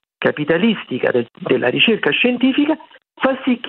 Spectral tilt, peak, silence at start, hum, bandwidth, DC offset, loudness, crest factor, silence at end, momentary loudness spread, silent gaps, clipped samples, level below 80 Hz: -8.5 dB/octave; -2 dBFS; 0.2 s; none; 4.3 kHz; under 0.1%; -17 LUFS; 16 dB; 0 s; 7 LU; none; under 0.1%; -62 dBFS